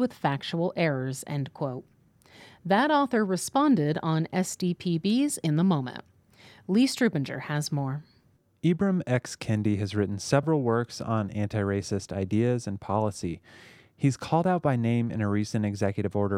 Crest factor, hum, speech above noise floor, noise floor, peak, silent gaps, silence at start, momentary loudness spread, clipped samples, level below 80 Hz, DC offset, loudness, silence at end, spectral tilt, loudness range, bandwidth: 18 dB; none; 38 dB; -64 dBFS; -8 dBFS; none; 0 s; 8 LU; under 0.1%; -62 dBFS; under 0.1%; -27 LUFS; 0 s; -6 dB/octave; 3 LU; 15.5 kHz